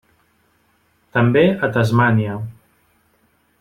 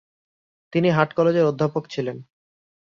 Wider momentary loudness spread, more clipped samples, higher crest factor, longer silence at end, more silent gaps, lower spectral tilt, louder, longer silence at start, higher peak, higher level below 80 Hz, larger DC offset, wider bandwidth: about the same, 13 LU vs 11 LU; neither; about the same, 18 dB vs 20 dB; first, 1.1 s vs 0.75 s; neither; about the same, -8 dB/octave vs -7.5 dB/octave; first, -17 LUFS vs -22 LUFS; first, 1.15 s vs 0.75 s; about the same, -2 dBFS vs -2 dBFS; first, -54 dBFS vs -62 dBFS; neither; first, 12 kHz vs 7.2 kHz